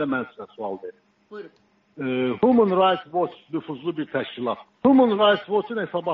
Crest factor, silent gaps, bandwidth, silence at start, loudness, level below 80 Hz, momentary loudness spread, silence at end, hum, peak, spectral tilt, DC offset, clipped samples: 16 dB; none; 4.8 kHz; 0 s; -22 LUFS; -66 dBFS; 19 LU; 0 s; none; -6 dBFS; -4 dB/octave; under 0.1%; under 0.1%